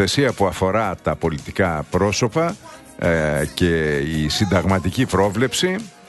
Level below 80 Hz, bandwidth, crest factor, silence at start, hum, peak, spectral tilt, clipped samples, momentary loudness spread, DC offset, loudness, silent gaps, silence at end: -38 dBFS; 12.5 kHz; 16 dB; 0 s; none; -4 dBFS; -5 dB/octave; under 0.1%; 5 LU; under 0.1%; -20 LUFS; none; 0.2 s